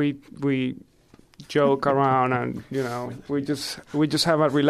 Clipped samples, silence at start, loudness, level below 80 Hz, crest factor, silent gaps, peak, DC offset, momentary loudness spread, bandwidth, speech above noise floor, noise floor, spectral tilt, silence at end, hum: under 0.1%; 0 s; -24 LUFS; -60 dBFS; 16 dB; none; -8 dBFS; under 0.1%; 9 LU; 14.5 kHz; 30 dB; -53 dBFS; -5.5 dB/octave; 0 s; none